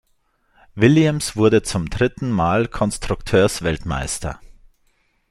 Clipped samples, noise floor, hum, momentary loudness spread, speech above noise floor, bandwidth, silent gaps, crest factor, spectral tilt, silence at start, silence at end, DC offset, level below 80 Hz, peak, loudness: under 0.1%; -64 dBFS; none; 10 LU; 45 dB; 14.5 kHz; none; 18 dB; -5.5 dB/octave; 0.75 s; 0.95 s; under 0.1%; -38 dBFS; -2 dBFS; -19 LUFS